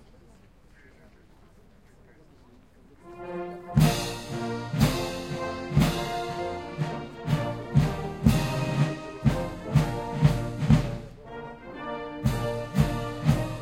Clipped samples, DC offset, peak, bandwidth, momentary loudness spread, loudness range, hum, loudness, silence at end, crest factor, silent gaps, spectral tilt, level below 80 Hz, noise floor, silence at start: under 0.1%; under 0.1%; -6 dBFS; 16.5 kHz; 13 LU; 5 LU; none; -27 LUFS; 0 s; 22 dB; none; -6.5 dB/octave; -40 dBFS; -56 dBFS; 3.05 s